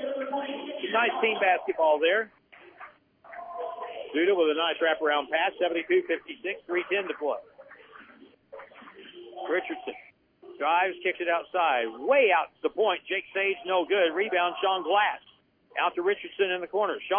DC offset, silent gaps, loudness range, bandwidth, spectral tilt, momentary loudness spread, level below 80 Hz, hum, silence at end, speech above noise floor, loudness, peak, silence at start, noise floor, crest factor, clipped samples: under 0.1%; none; 8 LU; 3.6 kHz; -6.5 dB/octave; 16 LU; -76 dBFS; none; 0 s; 28 dB; -27 LUFS; -10 dBFS; 0 s; -55 dBFS; 18 dB; under 0.1%